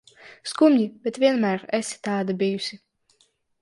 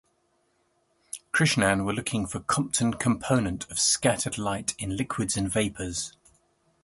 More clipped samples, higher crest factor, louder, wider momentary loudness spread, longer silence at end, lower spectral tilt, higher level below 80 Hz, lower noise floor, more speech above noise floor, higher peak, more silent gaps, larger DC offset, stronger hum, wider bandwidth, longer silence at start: neither; about the same, 18 dB vs 22 dB; first, -23 LUFS vs -26 LUFS; first, 13 LU vs 10 LU; about the same, 0.85 s vs 0.75 s; first, -5 dB/octave vs -3.5 dB/octave; second, -74 dBFS vs -50 dBFS; second, -65 dBFS vs -70 dBFS; about the same, 43 dB vs 44 dB; about the same, -6 dBFS vs -6 dBFS; neither; neither; neither; about the same, 11.5 kHz vs 12 kHz; second, 0.25 s vs 1.15 s